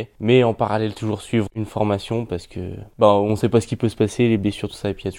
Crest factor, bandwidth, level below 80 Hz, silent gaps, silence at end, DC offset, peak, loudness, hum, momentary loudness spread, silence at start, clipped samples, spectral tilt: 20 dB; 15.5 kHz; -48 dBFS; none; 0 s; under 0.1%; 0 dBFS; -20 LUFS; none; 11 LU; 0 s; under 0.1%; -7 dB/octave